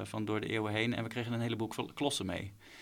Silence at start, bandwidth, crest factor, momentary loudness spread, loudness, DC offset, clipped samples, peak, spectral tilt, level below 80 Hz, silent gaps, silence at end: 0 s; 16.5 kHz; 20 dB; 6 LU; -36 LUFS; under 0.1%; under 0.1%; -16 dBFS; -5 dB/octave; -66 dBFS; none; 0 s